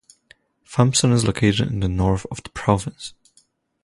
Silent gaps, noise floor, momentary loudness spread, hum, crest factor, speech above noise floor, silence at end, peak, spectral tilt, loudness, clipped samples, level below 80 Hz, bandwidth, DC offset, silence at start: none; -61 dBFS; 15 LU; none; 20 dB; 41 dB; 0.75 s; -2 dBFS; -5 dB/octave; -20 LUFS; under 0.1%; -38 dBFS; 11.5 kHz; under 0.1%; 0.7 s